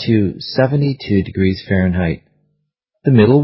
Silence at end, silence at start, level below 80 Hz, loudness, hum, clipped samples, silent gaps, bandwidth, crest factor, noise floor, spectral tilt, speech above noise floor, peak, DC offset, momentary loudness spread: 0 s; 0 s; -34 dBFS; -16 LUFS; none; under 0.1%; none; 5.8 kHz; 16 dB; -71 dBFS; -11.5 dB/octave; 57 dB; 0 dBFS; under 0.1%; 8 LU